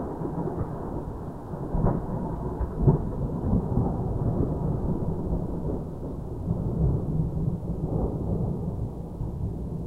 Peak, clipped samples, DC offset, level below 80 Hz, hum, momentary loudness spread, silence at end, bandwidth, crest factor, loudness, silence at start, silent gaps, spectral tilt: -8 dBFS; under 0.1%; 0.3%; -34 dBFS; none; 9 LU; 0 s; 4 kHz; 20 dB; -29 LUFS; 0 s; none; -11.5 dB/octave